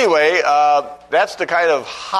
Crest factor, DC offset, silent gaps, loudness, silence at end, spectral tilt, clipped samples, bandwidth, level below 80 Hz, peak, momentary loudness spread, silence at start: 14 dB; under 0.1%; none; -16 LUFS; 0 s; -2.5 dB/octave; under 0.1%; 12 kHz; -60 dBFS; -2 dBFS; 6 LU; 0 s